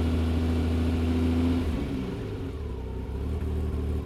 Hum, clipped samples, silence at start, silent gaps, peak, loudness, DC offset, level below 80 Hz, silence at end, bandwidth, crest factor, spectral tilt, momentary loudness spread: none; under 0.1%; 0 s; none; -16 dBFS; -29 LUFS; under 0.1%; -32 dBFS; 0 s; 12.5 kHz; 10 dB; -8 dB/octave; 9 LU